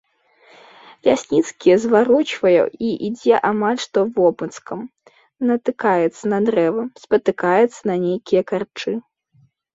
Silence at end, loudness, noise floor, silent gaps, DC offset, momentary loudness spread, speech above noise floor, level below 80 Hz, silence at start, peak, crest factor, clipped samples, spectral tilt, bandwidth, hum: 0.75 s; -18 LUFS; -58 dBFS; none; under 0.1%; 10 LU; 40 dB; -62 dBFS; 1.05 s; -2 dBFS; 16 dB; under 0.1%; -5.5 dB/octave; 8 kHz; none